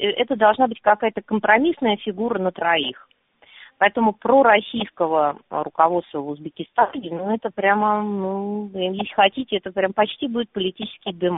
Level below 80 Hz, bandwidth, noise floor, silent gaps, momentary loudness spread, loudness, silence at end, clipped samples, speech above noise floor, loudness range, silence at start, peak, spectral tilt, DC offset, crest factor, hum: -62 dBFS; 4 kHz; -49 dBFS; none; 11 LU; -21 LUFS; 0 s; under 0.1%; 28 dB; 3 LU; 0 s; -2 dBFS; -2.5 dB/octave; under 0.1%; 20 dB; none